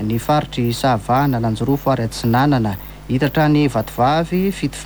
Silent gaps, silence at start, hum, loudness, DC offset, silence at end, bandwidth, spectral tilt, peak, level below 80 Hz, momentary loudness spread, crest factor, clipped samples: none; 0 s; none; -18 LUFS; under 0.1%; 0 s; over 20 kHz; -6.5 dB/octave; -4 dBFS; -38 dBFS; 5 LU; 12 dB; under 0.1%